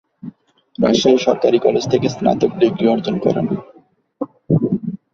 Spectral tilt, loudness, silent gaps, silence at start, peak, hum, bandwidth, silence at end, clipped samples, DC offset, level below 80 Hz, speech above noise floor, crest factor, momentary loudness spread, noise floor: -6.5 dB/octave; -17 LUFS; none; 0.25 s; -2 dBFS; none; 7.4 kHz; 0.2 s; under 0.1%; under 0.1%; -52 dBFS; 28 dB; 16 dB; 16 LU; -44 dBFS